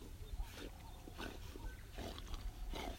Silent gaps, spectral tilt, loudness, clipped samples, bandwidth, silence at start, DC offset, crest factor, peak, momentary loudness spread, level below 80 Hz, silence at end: none; -4.5 dB/octave; -51 LUFS; under 0.1%; 16 kHz; 0 s; under 0.1%; 16 dB; -32 dBFS; 4 LU; -50 dBFS; 0 s